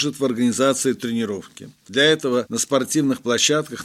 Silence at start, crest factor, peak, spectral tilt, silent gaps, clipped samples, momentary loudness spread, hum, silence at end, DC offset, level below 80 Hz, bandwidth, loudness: 0 s; 18 dB; -2 dBFS; -3 dB/octave; none; under 0.1%; 8 LU; none; 0 s; under 0.1%; -66 dBFS; 15.5 kHz; -20 LUFS